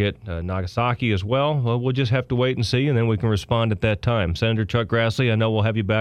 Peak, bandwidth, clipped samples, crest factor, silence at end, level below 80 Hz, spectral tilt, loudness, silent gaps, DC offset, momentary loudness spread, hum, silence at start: -4 dBFS; 10.5 kHz; under 0.1%; 16 dB; 0 s; -42 dBFS; -7 dB/octave; -22 LUFS; none; under 0.1%; 3 LU; none; 0 s